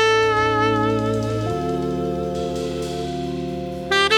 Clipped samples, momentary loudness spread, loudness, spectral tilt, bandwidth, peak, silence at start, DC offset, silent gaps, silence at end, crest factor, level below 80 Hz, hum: under 0.1%; 9 LU; -22 LUFS; -5 dB/octave; 16.5 kHz; -4 dBFS; 0 s; under 0.1%; none; 0 s; 16 dB; -40 dBFS; none